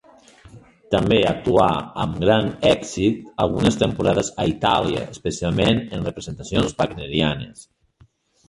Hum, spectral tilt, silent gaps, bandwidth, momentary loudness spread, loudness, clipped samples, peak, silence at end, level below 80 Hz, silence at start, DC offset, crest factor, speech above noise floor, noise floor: none; -5.5 dB/octave; none; 11.5 kHz; 9 LU; -21 LUFS; under 0.1%; -2 dBFS; 0.85 s; -42 dBFS; 0.45 s; under 0.1%; 20 dB; 36 dB; -56 dBFS